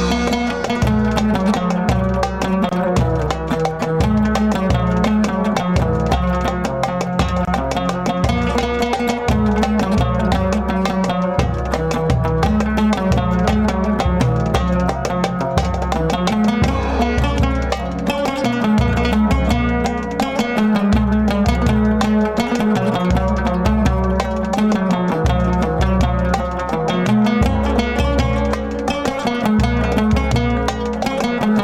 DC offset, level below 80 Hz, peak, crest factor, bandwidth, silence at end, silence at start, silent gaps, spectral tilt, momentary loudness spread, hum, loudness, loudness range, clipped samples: under 0.1%; -24 dBFS; -4 dBFS; 12 dB; 14 kHz; 0 s; 0 s; none; -6.5 dB/octave; 4 LU; none; -18 LUFS; 2 LU; under 0.1%